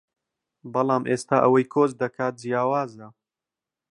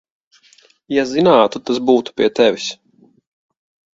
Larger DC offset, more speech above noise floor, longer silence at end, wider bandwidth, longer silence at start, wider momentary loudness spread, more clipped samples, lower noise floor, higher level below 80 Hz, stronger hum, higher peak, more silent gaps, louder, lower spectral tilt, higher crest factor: neither; first, 66 dB vs 37 dB; second, 0.8 s vs 1.2 s; first, 11.5 kHz vs 7.8 kHz; second, 0.65 s vs 0.9 s; second, 9 LU vs 12 LU; neither; first, -89 dBFS vs -52 dBFS; second, -72 dBFS vs -60 dBFS; neither; second, -4 dBFS vs 0 dBFS; neither; second, -23 LUFS vs -16 LUFS; first, -6.5 dB/octave vs -5 dB/octave; about the same, 20 dB vs 18 dB